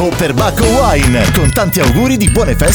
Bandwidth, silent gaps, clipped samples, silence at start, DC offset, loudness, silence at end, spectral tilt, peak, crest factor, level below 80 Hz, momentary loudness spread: over 20 kHz; none; under 0.1%; 0 s; under 0.1%; -11 LUFS; 0 s; -5 dB/octave; 0 dBFS; 10 dB; -18 dBFS; 2 LU